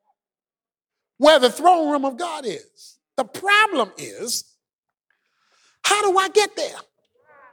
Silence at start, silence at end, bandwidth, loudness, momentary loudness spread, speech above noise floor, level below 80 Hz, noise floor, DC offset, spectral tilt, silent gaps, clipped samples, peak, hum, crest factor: 1.2 s; 0.7 s; over 20 kHz; -19 LUFS; 15 LU; over 71 dB; -70 dBFS; under -90 dBFS; under 0.1%; -1.5 dB/octave; 4.73-4.83 s; under 0.1%; -2 dBFS; none; 20 dB